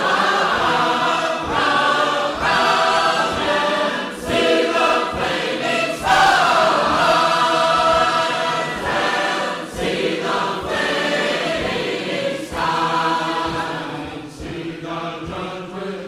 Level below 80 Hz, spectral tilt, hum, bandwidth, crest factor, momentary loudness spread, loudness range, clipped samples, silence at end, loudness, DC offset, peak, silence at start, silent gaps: -46 dBFS; -3.5 dB/octave; none; 15.5 kHz; 14 dB; 12 LU; 6 LU; under 0.1%; 0 s; -18 LUFS; under 0.1%; -4 dBFS; 0 s; none